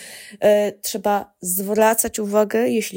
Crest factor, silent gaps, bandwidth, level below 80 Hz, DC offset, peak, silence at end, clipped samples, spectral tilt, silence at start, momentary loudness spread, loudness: 16 dB; none; 17 kHz; -58 dBFS; under 0.1%; -4 dBFS; 0 s; under 0.1%; -3.5 dB/octave; 0 s; 7 LU; -19 LUFS